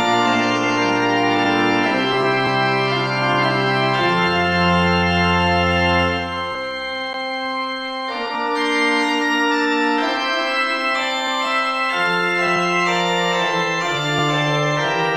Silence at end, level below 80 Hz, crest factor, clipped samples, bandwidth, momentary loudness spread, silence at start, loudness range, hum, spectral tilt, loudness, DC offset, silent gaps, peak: 0 s; -52 dBFS; 14 dB; under 0.1%; 14.5 kHz; 7 LU; 0 s; 3 LU; none; -4.5 dB/octave; -18 LUFS; 0.2%; none; -4 dBFS